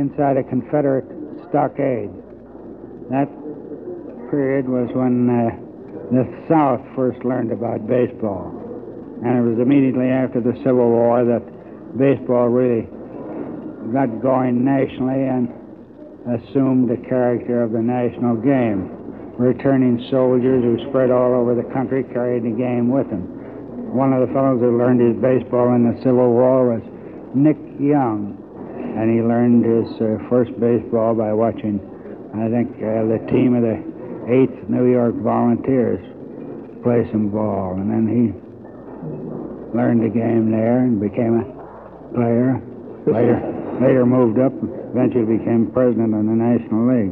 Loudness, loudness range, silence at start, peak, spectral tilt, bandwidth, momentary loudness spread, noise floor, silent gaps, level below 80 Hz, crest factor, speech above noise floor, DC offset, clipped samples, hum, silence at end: -18 LUFS; 4 LU; 0 s; -2 dBFS; -12 dB/octave; 4.3 kHz; 17 LU; -39 dBFS; none; -54 dBFS; 16 dB; 22 dB; under 0.1%; under 0.1%; none; 0 s